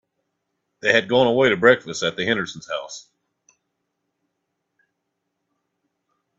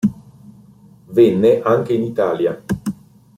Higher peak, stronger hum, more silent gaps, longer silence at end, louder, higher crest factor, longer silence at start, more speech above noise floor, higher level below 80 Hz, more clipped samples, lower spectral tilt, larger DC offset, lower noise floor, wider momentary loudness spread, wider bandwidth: about the same, -2 dBFS vs -2 dBFS; neither; neither; first, 3.4 s vs 0.45 s; about the same, -19 LUFS vs -17 LUFS; first, 22 dB vs 16 dB; first, 0.85 s vs 0.05 s; first, 58 dB vs 31 dB; second, -64 dBFS vs -52 dBFS; neither; second, -4 dB/octave vs -8 dB/octave; neither; first, -77 dBFS vs -46 dBFS; about the same, 14 LU vs 12 LU; second, 7.8 kHz vs 15 kHz